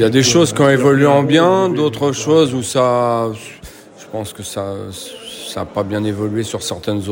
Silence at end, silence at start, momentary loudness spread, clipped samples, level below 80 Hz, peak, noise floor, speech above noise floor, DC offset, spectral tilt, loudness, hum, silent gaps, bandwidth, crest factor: 0 s; 0 s; 17 LU; under 0.1%; -50 dBFS; 0 dBFS; -37 dBFS; 22 dB; under 0.1%; -5 dB/octave; -15 LUFS; none; none; 16.5 kHz; 14 dB